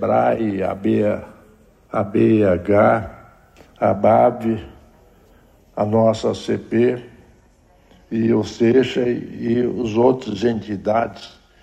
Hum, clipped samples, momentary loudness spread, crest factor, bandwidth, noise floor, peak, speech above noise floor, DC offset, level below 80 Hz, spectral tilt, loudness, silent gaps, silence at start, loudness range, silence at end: none; under 0.1%; 10 LU; 16 dB; 9.4 kHz; -53 dBFS; -4 dBFS; 35 dB; under 0.1%; -50 dBFS; -7.5 dB/octave; -19 LUFS; none; 0 s; 4 LU; 0.35 s